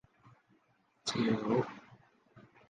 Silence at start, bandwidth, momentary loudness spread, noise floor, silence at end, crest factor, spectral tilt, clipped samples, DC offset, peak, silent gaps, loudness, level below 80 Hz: 1.05 s; 9.6 kHz; 12 LU; -73 dBFS; 0.3 s; 20 dB; -5.5 dB/octave; under 0.1%; under 0.1%; -18 dBFS; none; -34 LUFS; -72 dBFS